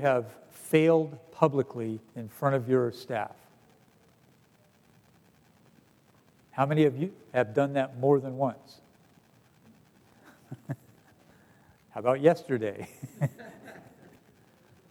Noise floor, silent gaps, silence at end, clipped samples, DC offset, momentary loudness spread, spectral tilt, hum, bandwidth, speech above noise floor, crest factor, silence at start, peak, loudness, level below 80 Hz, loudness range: -63 dBFS; none; 1.1 s; under 0.1%; under 0.1%; 21 LU; -7.5 dB/octave; none; 17.5 kHz; 35 dB; 24 dB; 0 s; -8 dBFS; -28 LUFS; -78 dBFS; 12 LU